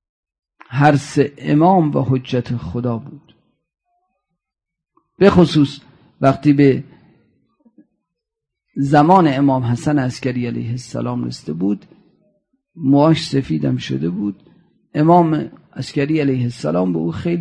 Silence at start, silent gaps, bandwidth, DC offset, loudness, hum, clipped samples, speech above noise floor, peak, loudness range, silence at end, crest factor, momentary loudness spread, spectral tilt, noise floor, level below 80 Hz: 0.7 s; none; 10.5 kHz; under 0.1%; -17 LUFS; none; under 0.1%; 67 dB; -2 dBFS; 4 LU; 0 s; 16 dB; 12 LU; -7.5 dB/octave; -83 dBFS; -50 dBFS